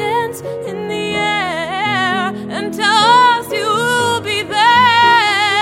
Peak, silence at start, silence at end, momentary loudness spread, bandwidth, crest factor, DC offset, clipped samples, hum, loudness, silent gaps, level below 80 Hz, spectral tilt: 0 dBFS; 0 s; 0 s; 13 LU; 16 kHz; 14 dB; under 0.1%; under 0.1%; none; -13 LUFS; none; -52 dBFS; -3 dB/octave